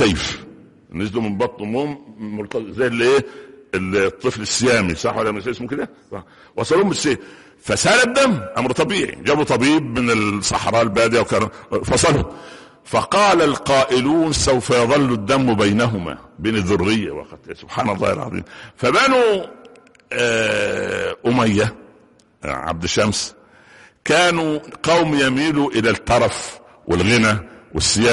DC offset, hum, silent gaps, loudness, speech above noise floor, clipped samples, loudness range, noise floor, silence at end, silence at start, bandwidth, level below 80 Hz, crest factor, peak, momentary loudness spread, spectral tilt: under 0.1%; none; none; -18 LUFS; 34 dB; under 0.1%; 4 LU; -52 dBFS; 0 s; 0 s; 11.5 kHz; -42 dBFS; 14 dB; -4 dBFS; 14 LU; -4 dB/octave